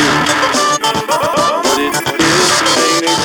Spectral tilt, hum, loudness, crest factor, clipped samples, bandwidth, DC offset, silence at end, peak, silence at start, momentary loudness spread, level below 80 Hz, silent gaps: -2 dB/octave; none; -12 LUFS; 12 dB; under 0.1%; 19.5 kHz; under 0.1%; 0 s; 0 dBFS; 0 s; 4 LU; -44 dBFS; none